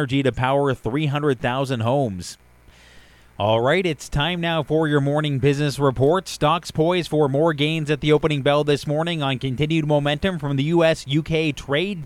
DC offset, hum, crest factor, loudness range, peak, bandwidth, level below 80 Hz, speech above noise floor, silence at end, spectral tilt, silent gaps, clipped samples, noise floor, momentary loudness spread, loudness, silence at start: under 0.1%; none; 16 dB; 3 LU; -4 dBFS; 14 kHz; -44 dBFS; 29 dB; 0 s; -6 dB/octave; none; under 0.1%; -50 dBFS; 5 LU; -21 LUFS; 0 s